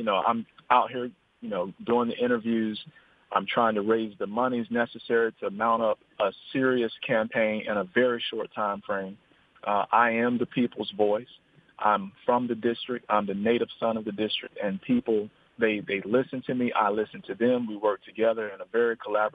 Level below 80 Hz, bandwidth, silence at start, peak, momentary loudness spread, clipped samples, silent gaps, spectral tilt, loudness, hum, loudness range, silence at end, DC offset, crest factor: -70 dBFS; 4.9 kHz; 0 s; -6 dBFS; 8 LU; under 0.1%; none; -8 dB/octave; -27 LUFS; none; 1 LU; 0.05 s; under 0.1%; 20 dB